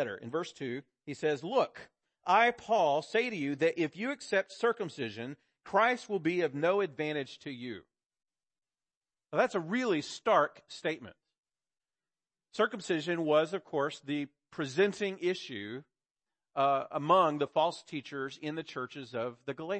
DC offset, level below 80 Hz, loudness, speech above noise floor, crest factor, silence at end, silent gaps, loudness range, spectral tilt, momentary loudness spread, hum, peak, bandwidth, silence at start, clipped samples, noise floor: under 0.1%; -80 dBFS; -32 LUFS; over 58 dB; 20 dB; 0 s; 8.06-8.10 s, 8.97-9.01 s, 11.38-11.43 s, 16.11-16.15 s; 5 LU; -5 dB/octave; 14 LU; none; -12 dBFS; 8.8 kHz; 0 s; under 0.1%; under -90 dBFS